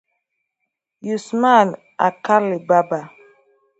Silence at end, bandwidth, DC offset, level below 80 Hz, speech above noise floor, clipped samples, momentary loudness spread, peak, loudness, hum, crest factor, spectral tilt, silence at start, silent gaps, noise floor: 0.7 s; 8.2 kHz; under 0.1%; -72 dBFS; 61 dB; under 0.1%; 12 LU; 0 dBFS; -18 LUFS; none; 20 dB; -6 dB/octave; 1.05 s; none; -78 dBFS